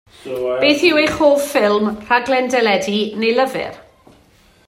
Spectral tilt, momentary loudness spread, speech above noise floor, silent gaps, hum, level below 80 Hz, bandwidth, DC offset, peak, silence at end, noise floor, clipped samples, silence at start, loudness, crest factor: -4 dB/octave; 10 LU; 36 dB; none; none; -52 dBFS; 16 kHz; under 0.1%; 0 dBFS; 0.85 s; -51 dBFS; under 0.1%; 0.25 s; -16 LUFS; 16 dB